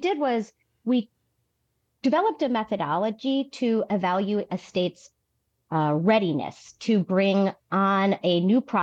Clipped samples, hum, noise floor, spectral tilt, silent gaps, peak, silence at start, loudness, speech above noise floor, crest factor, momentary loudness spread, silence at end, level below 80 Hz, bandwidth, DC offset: under 0.1%; none; -75 dBFS; -7 dB/octave; none; -8 dBFS; 0 s; -25 LUFS; 51 dB; 16 dB; 9 LU; 0 s; -70 dBFS; 8 kHz; under 0.1%